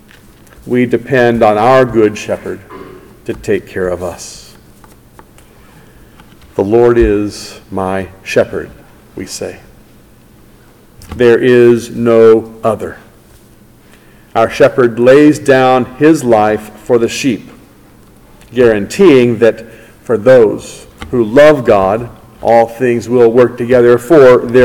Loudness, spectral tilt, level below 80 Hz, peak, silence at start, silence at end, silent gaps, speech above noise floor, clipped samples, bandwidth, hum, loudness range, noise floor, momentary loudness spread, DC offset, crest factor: -10 LUFS; -6 dB/octave; -36 dBFS; 0 dBFS; 0.65 s; 0 s; none; 32 dB; 3%; 17 kHz; none; 11 LU; -41 dBFS; 19 LU; under 0.1%; 12 dB